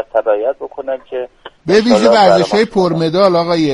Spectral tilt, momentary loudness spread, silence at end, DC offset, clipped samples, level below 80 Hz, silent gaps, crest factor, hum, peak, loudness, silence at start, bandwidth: -5.5 dB/octave; 15 LU; 0 s; under 0.1%; under 0.1%; -48 dBFS; none; 12 dB; none; 0 dBFS; -12 LUFS; 0 s; 11.5 kHz